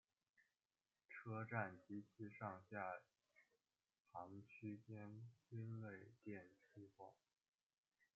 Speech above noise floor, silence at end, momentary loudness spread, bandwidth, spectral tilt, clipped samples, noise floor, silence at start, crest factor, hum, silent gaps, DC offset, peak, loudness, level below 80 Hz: over 36 dB; 1 s; 15 LU; 7.2 kHz; -8 dB/octave; under 0.1%; under -90 dBFS; 0.4 s; 28 dB; none; 4.00-4.05 s; under 0.1%; -28 dBFS; -55 LUFS; under -90 dBFS